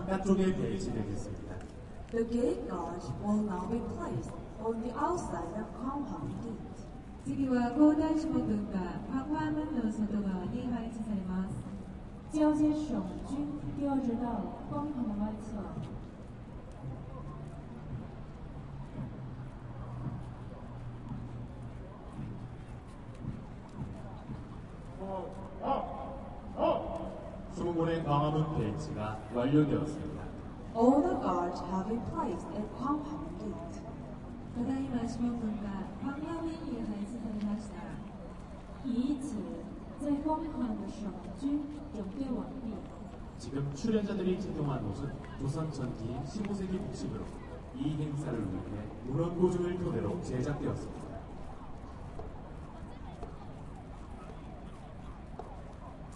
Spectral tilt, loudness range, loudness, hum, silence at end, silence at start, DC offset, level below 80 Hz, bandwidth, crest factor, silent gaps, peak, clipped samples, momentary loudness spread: -7.5 dB/octave; 13 LU; -36 LUFS; none; 0 s; 0 s; under 0.1%; -50 dBFS; 11 kHz; 22 dB; none; -12 dBFS; under 0.1%; 16 LU